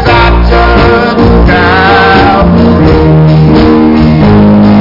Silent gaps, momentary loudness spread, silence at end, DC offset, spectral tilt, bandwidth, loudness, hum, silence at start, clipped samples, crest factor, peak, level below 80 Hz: none; 2 LU; 0 s; under 0.1%; -8.5 dB/octave; 5.8 kHz; -4 LUFS; none; 0 s; 0.2%; 4 dB; 0 dBFS; -12 dBFS